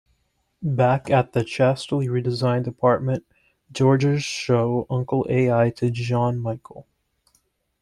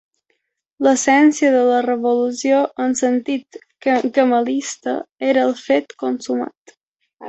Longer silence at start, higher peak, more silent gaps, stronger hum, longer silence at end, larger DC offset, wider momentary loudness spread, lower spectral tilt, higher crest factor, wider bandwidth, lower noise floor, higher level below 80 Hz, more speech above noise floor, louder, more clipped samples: second, 0.6 s vs 0.8 s; about the same, -4 dBFS vs -2 dBFS; second, none vs 5.12-5.16 s, 6.57-6.66 s, 6.77-6.96 s; neither; first, 1 s vs 0 s; neither; second, 8 LU vs 11 LU; first, -7 dB/octave vs -3 dB/octave; about the same, 18 dB vs 16 dB; first, 10.5 kHz vs 8.2 kHz; about the same, -69 dBFS vs -70 dBFS; first, -56 dBFS vs -66 dBFS; second, 48 dB vs 53 dB; second, -22 LUFS vs -18 LUFS; neither